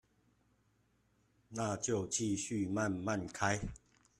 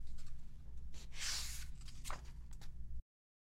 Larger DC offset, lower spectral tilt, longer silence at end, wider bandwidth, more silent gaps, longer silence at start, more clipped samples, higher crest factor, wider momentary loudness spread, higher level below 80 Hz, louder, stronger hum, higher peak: neither; first, -4.5 dB/octave vs -1.5 dB/octave; about the same, 0.45 s vs 0.55 s; second, 14 kHz vs 16 kHz; neither; first, 1.5 s vs 0 s; neither; about the same, 20 dB vs 16 dB; second, 5 LU vs 15 LU; second, -60 dBFS vs -50 dBFS; first, -37 LUFS vs -49 LUFS; neither; first, -18 dBFS vs -28 dBFS